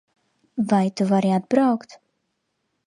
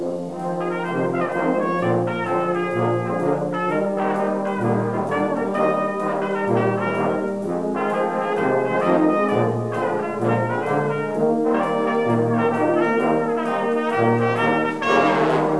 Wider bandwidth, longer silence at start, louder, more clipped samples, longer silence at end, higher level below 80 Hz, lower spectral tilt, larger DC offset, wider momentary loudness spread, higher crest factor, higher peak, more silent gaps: about the same, 11 kHz vs 11 kHz; first, 0.55 s vs 0 s; about the same, -21 LUFS vs -21 LUFS; neither; first, 0.9 s vs 0 s; second, -70 dBFS vs -64 dBFS; about the same, -7.5 dB/octave vs -7.5 dB/octave; second, under 0.1% vs 0.4%; first, 9 LU vs 5 LU; about the same, 18 dB vs 18 dB; about the same, -6 dBFS vs -4 dBFS; neither